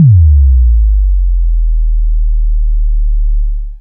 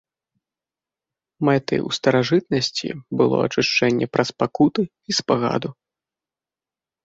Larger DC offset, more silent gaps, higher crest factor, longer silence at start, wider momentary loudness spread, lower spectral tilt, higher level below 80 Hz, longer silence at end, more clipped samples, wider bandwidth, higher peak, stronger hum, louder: neither; neither; second, 8 dB vs 20 dB; second, 0 s vs 1.4 s; about the same, 9 LU vs 7 LU; first, -15.5 dB/octave vs -5 dB/octave; first, -8 dBFS vs -60 dBFS; second, 0 s vs 1.35 s; neither; second, 0.2 kHz vs 8 kHz; about the same, 0 dBFS vs -2 dBFS; neither; first, -13 LUFS vs -21 LUFS